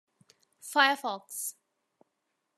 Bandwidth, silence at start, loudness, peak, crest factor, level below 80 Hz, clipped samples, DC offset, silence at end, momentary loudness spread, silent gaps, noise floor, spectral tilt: 13.5 kHz; 0.65 s; -29 LUFS; -8 dBFS; 26 dB; under -90 dBFS; under 0.1%; under 0.1%; 1.05 s; 14 LU; none; -81 dBFS; 0 dB/octave